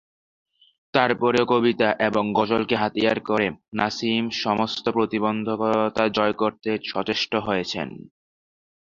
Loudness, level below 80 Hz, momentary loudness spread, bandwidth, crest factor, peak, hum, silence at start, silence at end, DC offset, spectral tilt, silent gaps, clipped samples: -23 LUFS; -58 dBFS; 6 LU; 7.6 kHz; 22 dB; -2 dBFS; none; 0.95 s; 0.9 s; under 0.1%; -5.5 dB/octave; 3.68-3.72 s; under 0.1%